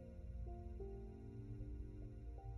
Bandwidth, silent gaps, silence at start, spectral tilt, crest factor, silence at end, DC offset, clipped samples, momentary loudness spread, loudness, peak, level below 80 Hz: 5.8 kHz; none; 0 s; -10 dB/octave; 12 dB; 0 s; under 0.1%; under 0.1%; 2 LU; -53 LUFS; -38 dBFS; -52 dBFS